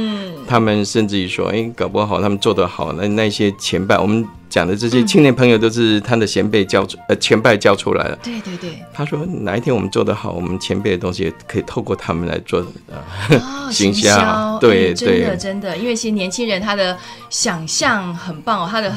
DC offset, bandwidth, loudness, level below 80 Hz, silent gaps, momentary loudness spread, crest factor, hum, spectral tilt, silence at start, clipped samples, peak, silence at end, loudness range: under 0.1%; 15.5 kHz; -16 LUFS; -46 dBFS; none; 11 LU; 16 dB; none; -4.5 dB/octave; 0 s; under 0.1%; 0 dBFS; 0 s; 6 LU